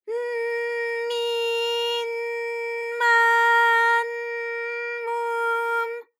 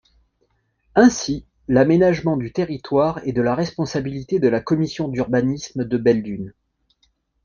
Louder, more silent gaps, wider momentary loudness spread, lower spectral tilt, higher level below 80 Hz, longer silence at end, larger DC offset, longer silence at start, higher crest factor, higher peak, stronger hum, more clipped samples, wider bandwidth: second, -23 LUFS vs -20 LUFS; neither; about the same, 11 LU vs 11 LU; second, 3.5 dB/octave vs -6.5 dB/octave; second, under -90 dBFS vs -50 dBFS; second, 0.15 s vs 0.95 s; neither; second, 0.05 s vs 0.95 s; about the same, 14 dB vs 18 dB; second, -8 dBFS vs -2 dBFS; neither; neither; first, 15.5 kHz vs 7.4 kHz